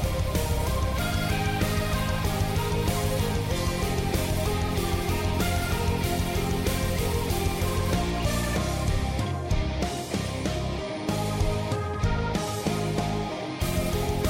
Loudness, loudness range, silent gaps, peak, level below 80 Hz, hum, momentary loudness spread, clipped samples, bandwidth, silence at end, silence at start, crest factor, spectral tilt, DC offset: -27 LUFS; 2 LU; none; -14 dBFS; -32 dBFS; none; 3 LU; under 0.1%; 16.5 kHz; 0 s; 0 s; 12 dB; -5 dB/octave; under 0.1%